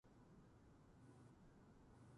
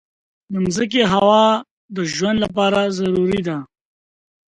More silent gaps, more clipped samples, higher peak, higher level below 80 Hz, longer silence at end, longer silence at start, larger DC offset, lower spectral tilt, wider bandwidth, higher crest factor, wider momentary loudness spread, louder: second, none vs 1.71-1.89 s; neither; second, -54 dBFS vs -2 dBFS; second, -76 dBFS vs -50 dBFS; second, 0 s vs 0.85 s; second, 0.05 s vs 0.5 s; neither; first, -7 dB/octave vs -5 dB/octave; about the same, 11 kHz vs 10.5 kHz; second, 12 dB vs 18 dB; second, 2 LU vs 13 LU; second, -68 LUFS vs -18 LUFS